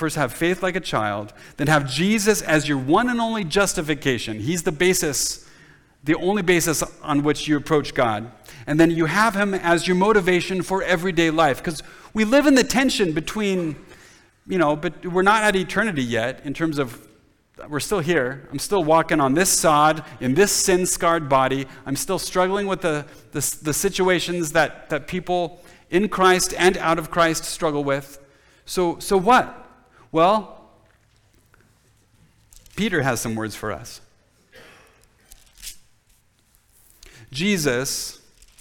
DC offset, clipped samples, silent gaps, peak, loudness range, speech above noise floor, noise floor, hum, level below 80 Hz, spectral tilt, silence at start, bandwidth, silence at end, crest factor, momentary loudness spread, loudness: under 0.1%; under 0.1%; none; -4 dBFS; 9 LU; 40 dB; -60 dBFS; none; -46 dBFS; -4 dB/octave; 0 s; 19.5 kHz; 0.45 s; 18 dB; 12 LU; -21 LUFS